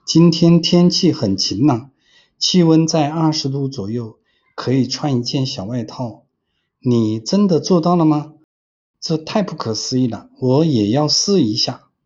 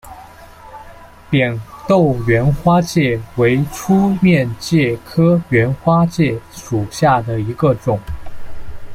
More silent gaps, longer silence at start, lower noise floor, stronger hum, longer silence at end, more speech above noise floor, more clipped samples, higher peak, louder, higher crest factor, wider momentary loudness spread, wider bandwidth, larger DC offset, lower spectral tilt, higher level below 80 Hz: first, 8.44-8.94 s vs none; about the same, 0.05 s vs 0.05 s; first, -71 dBFS vs -38 dBFS; neither; first, 0.3 s vs 0 s; first, 56 dB vs 24 dB; neither; about the same, -2 dBFS vs -2 dBFS; about the same, -16 LUFS vs -15 LUFS; about the same, 16 dB vs 14 dB; first, 13 LU vs 8 LU; second, 7.6 kHz vs 15.5 kHz; neither; second, -5.5 dB/octave vs -7 dB/octave; second, -56 dBFS vs -36 dBFS